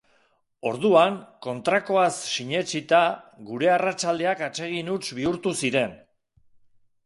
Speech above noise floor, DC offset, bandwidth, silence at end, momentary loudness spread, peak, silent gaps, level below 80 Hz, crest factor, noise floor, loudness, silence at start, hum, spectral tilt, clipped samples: 42 dB; under 0.1%; 11.5 kHz; 1.1 s; 11 LU; -4 dBFS; none; -66 dBFS; 20 dB; -66 dBFS; -24 LUFS; 0.65 s; none; -4 dB/octave; under 0.1%